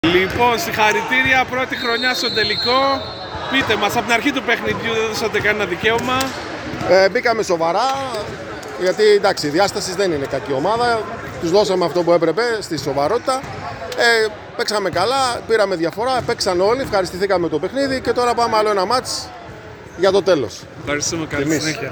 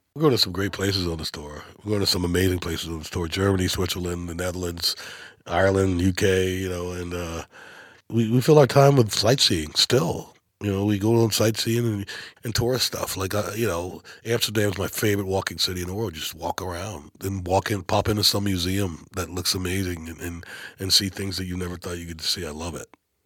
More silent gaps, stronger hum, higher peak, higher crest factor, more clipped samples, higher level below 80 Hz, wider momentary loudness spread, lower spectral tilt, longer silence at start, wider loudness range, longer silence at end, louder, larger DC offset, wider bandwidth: neither; neither; about the same, 0 dBFS vs -2 dBFS; second, 16 dB vs 22 dB; neither; about the same, -46 dBFS vs -48 dBFS; second, 10 LU vs 14 LU; about the same, -3.5 dB/octave vs -4.5 dB/octave; about the same, 0.05 s vs 0.15 s; second, 2 LU vs 6 LU; second, 0 s vs 0.4 s; first, -17 LUFS vs -23 LUFS; neither; first, over 20 kHz vs 17.5 kHz